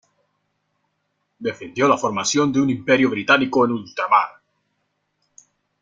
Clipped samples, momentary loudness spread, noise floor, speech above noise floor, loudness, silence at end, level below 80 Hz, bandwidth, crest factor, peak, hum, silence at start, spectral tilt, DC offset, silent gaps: under 0.1%; 12 LU; -72 dBFS; 54 dB; -19 LUFS; 1.5 s; -64 dBFS; 9.4 kHz; 20 dB; -2 dBFS; none; 1.4 s; -4 dB/octave; under 0.1%; none